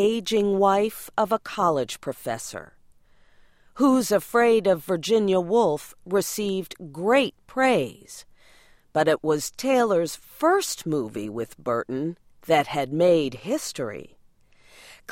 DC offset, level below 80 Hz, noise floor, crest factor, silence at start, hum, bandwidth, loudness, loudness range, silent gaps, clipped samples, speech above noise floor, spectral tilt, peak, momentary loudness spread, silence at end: under 0.1%; -60 dBFS; -56 dBFS; 18 dB; 0 s; none; 16.5 kHz; -24 LUFS; 3 LU; none; under 0.1%; 33 dB; -4.5 dB/octave; -8 dBFS; 12 LU; 0 s